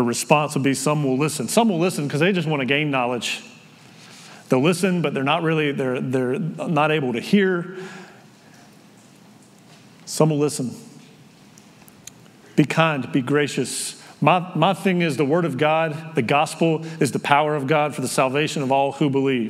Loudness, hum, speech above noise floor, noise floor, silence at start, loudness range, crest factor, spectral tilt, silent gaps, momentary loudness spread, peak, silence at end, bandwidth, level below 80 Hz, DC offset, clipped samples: -21 LUFS; none; 28 dB; -49 dBFS; 0 s; 7 LU; 22 dB; -5 dB/octave; none; 8 LU; 0 dBFS; 0 s; 15.5 kHz; -74 dBFS; under 0.1%; under 0.1%